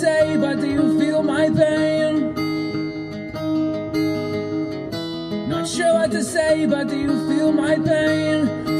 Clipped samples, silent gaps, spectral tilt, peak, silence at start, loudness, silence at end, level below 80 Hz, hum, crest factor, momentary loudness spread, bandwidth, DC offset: under 0.1%; none; -5.5 dB/octave; -4 dBFS; 0 s; -20 LUFS; 0 s; -50 dBFS; none; 14 dB; 9 LU; 13 kHz; under 0.1%